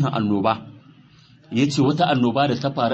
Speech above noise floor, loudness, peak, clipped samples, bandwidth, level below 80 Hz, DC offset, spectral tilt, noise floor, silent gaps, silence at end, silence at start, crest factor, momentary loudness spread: 31 dB; -21 LUFS; -6 dBFS; under 0.1%; 8.6 kHz; -58 dBFS; under 0.1%; -6.5 dB/octave; -51 dBFS; none; 0 s; 0 s; 14 dB; 5 LU